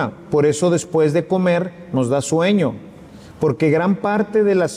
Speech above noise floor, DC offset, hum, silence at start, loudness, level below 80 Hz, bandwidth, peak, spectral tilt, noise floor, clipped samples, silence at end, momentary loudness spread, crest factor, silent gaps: 22 dB; under 0.1%; none; 0 s; -18 LUFS; -56 dBFS; 14 kHz; -4 dBFS; -6 dB/octave; -40 dBFS; under 0.1%; 0 s; 6 LU; 12 dB; none